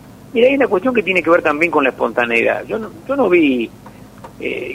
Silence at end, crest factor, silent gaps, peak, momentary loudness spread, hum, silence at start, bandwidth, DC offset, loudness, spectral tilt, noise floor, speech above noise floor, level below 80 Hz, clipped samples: 0 s; 16 dB; none; 0 dBFS; 12 LU; none; 0.05 s; 15.5 kHz; under 0.1%; -15 LUFS; -6 dB/octave; -37 dBFS; 22 dB; -50 dBFS; under 0.1%